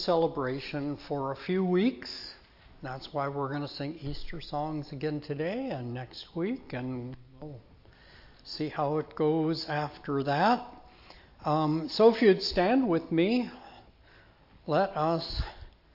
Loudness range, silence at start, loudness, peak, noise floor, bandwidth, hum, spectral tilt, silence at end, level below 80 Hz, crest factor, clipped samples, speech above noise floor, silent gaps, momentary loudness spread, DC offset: 10 LU; 0 s; -30 LUFS; -10 dBFS; -58 dBFS; 5.8 kHz; none; -7 dB/octave; 0.25 s; -50 dBFS; 22 dB; under 0.1%; 28 dB; none; 16 LU; under 0.1%